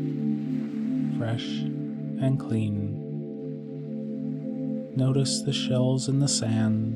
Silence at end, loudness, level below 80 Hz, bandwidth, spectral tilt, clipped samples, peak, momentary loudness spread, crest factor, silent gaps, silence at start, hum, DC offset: 0 s; -28 LUFS; -64 dBFS; 12 kHz; -5.5 dB/octave; under 0.1%; -12 dBFS; 10 LU; 16 dB; none; 0 s; none; under 0.1%